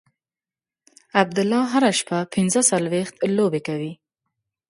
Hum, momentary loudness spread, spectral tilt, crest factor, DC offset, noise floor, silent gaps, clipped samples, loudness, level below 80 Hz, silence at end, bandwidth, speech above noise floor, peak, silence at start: none; 8 LU; -4 dB/octave; 22 dB; under 0.1%; under -90 dBFS; none; under 0.1%; -21 LUFS; -66 dBFS; 0.75 s; 11.5 kHz; over 69 dB; 0 dBFS; 1.15 s